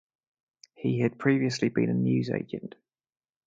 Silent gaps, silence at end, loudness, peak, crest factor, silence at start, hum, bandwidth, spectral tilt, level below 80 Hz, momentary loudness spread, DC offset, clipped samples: none; 0.8 s; -27 LUFS; -10 dBFS; 20 dB; 0.8 s; none; 7.8 kHz; -7 dB/octave; -68 dBFS; 12 LU; under 0.1%; under 0.1%